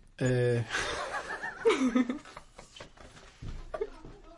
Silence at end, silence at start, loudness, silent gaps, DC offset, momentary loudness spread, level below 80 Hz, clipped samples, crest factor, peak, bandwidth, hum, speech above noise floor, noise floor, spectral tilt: 0 s; 0.05 s; -31 LUFS; none; under 0.1%; 23 LU; -50 dBFS; under 0.1%; 18 dB; -14 dBFS; 11.5 kHz; none; 24 dB; -53 dBFS; -5.5 dB/octave